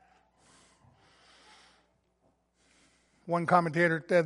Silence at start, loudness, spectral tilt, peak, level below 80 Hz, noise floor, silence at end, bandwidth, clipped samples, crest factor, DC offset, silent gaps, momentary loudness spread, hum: 3.25 s; -27 LUFS; -7 dB/octave; -8 dBFS; -76 dBFS; -72 dBFS; 0 s; 11.5 kHz; under 0.1%; 24 dB; under 0.1%; none; 11 LU; none